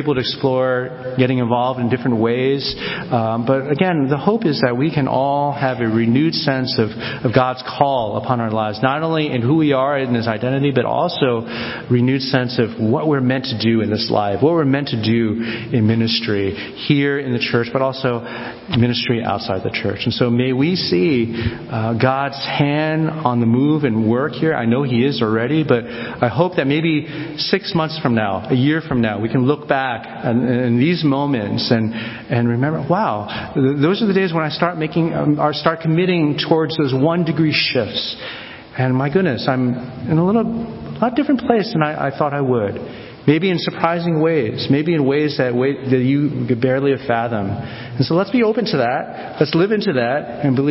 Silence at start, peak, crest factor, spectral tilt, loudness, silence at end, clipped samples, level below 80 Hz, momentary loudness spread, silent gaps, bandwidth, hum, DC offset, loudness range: 0 s; 0 dBFS; 18 dB; -10.5 dB/octave; -18 LUFS; 0 s; under 0.1%; -48 dBFS; 6 LU; none; 5.8 kHz; none; under 0.1%; 1 LU